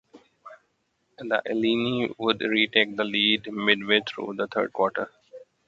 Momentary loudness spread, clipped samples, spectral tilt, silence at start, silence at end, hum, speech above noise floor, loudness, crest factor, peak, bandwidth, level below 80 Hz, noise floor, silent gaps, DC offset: 10 LU; under 0.1%; -5.5 dB/octave; 0.15 s; 0.25 s; none; 47 dB; -24 LUFS; 24 dB; -4 dBFS; 7.6 kHz; -68 dBFS; -72 dBFS; none; under 0.1%